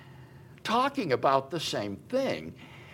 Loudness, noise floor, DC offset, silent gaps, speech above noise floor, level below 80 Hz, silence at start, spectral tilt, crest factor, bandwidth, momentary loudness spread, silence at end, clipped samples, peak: -29 LUFS; -50 dBFS; under 0.1%; none; 21 dB; -66 dBFS; 0 s; -4.5 dB/octave; 20 dB; 16.5 kHz; 13 LU; 0 s; under 0.1%; -10 dBFS